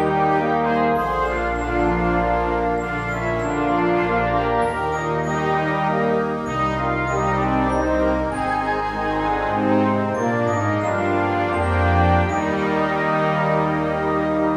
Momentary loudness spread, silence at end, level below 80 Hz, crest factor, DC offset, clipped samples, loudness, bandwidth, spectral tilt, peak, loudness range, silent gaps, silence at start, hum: 4 LU; 0 s; -36 dBFS; 14 dB; under 0.1%; under 0.1%; -20 LUFS; 12 kHz; -7 dB/octave; -6 dBFS; 1 LU; none; 0 s; none